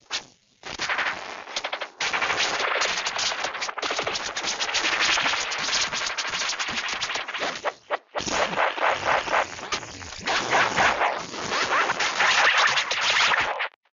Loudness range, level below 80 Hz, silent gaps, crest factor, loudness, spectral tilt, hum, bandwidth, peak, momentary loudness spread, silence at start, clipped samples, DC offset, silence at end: 5 LU; -58 dBFS; none; 18 dB; -24 LUFS; -0.5 dB/octave; none; 8 kHz; -8 dBFS; 11 LU; 0.1 s; under 0.1%; under 0.1%; 0.25 s